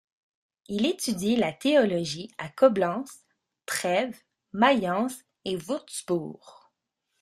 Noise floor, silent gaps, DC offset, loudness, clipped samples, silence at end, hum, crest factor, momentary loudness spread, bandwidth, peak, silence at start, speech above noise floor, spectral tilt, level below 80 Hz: -80 dBFS; none; under 0.1%; -26 LUFS; under 0.1%; 0.7 s; none; 22 dB; 14 LU; 14.5 kHz; -6 dBFS; 0.7 s; 54 dB; -4.5 dB/octave; -68 dBFS